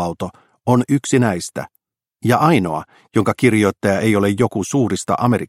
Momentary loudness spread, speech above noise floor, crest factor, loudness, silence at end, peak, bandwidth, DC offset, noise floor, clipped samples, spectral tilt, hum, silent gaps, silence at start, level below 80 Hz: 13 LU; 44 dB; 18 dB; -17 LUFS; 0.05 s; 0 dBFS; 16 kHz; under 0.1%; -60 dBFS; under 0.1%; -6 dB/octave; none; none; 0 s; -52 dBFS